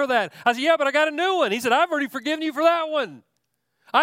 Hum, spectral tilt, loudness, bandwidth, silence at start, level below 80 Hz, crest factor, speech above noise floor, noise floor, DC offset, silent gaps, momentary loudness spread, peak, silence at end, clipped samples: none; -3 dB/octave; -21 LUFS; 16.5 kHz; 0 s; -76 dBFS; 18 dB; 53 dB; -75 dBFS; under 0.1%; none; 6 LU; -4 dBFS; 0 s; under 0.1%